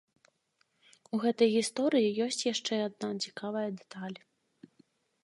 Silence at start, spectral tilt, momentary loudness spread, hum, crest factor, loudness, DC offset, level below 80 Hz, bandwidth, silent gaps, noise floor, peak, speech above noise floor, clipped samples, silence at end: 1.15 s; -4 dB/octave; 15 LU; none; 20 dB; -31 LUFS; under 0.1%; -86 dBFS; 11.5 kHz; none; -75 dBFS; -14 dBFS; 44 dB; under 0.1%; 1.05 s